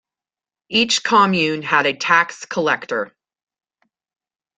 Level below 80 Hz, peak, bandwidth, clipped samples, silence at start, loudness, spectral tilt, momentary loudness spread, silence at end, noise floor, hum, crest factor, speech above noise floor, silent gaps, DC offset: -64 dBFS; -2 dBFS; 9.6 kHz; under 0.1%; 0.7 s; -17 LUFS; -3 dB/octave; 9 LU; 1.5 s; under -90 dBFS; none; 18 dB; over 72 dB; none; under 0.1%